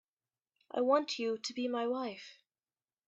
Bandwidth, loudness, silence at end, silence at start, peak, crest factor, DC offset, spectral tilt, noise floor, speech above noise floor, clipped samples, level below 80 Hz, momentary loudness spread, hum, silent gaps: 8.4 kHz; -35 LUFS; 0.75 s; 0.75 s; -16 dBFS; 22 dB; under 0.1%; -3 dB/octave; under -90 dBFS; over 56 dB; under 0.1%; -86 dBFS; 13 LU; none; none